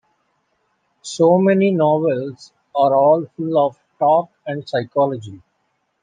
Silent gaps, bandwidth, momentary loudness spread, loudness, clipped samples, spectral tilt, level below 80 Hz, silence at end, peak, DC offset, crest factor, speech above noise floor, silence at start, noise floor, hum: none; 9.6 kHz; 16 LU; -17 LUFS; under 0.1%; -7 dB/octave; -68 dBFS; 0.65 s; -2 dBFS; under 0.1%; 16 dB; 52 dB; 1.05 s; -69 dBFS; none